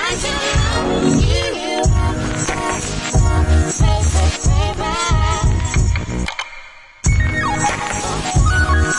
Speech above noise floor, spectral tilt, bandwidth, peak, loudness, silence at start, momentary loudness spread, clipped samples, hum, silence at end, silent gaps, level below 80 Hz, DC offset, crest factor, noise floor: 21 dB; -4.5 dB/octave; 11.5 kHz; -4 dBFS; -17 LUFS; 0 s; 6 LU; under 0.1%; none; 0 s; none; -20 dBFS; under 0.1%; 14 dB; -37 dBFS